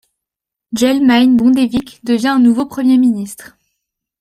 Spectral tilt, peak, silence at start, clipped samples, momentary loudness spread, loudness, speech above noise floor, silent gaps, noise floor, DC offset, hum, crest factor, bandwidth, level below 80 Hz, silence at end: -5 dB/octave; -2 dBFS; 0.7 s; under 0.1%; 13 LU; -13 LUFS; 71 dB; none; -83 dBFS; under 0.1%; none; 12 dB; 14.5 kHz; -52 dBFS; 0.75 s